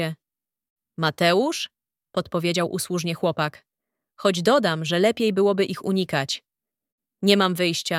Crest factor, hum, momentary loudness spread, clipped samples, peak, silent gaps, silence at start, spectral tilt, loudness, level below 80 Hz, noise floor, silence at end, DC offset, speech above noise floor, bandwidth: 22 dB; none; 11 LU; under 0.1%; -2 dBFS; 0.70-0.76 s, 6.92-6.98 s; 0 s; -4.5 dB/octave; -23 LUFS; -66 dBFS; under -90 dBFS; 0 s; under 0.1%; over 68 dB; 16.5 kHz